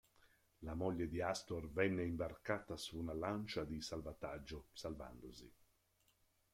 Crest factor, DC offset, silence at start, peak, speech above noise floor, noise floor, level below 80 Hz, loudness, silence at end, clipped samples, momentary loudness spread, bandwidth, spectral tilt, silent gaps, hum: 22 dB; under 0.1%; 0.25 s; -22 dBFS; 35 dB; -79 dBFS; -62 dBFS; -44 LUFS; 1.05 s; under 0.1%; 13 LU; 16.5 kHz; -5.5 dB/octave; none; none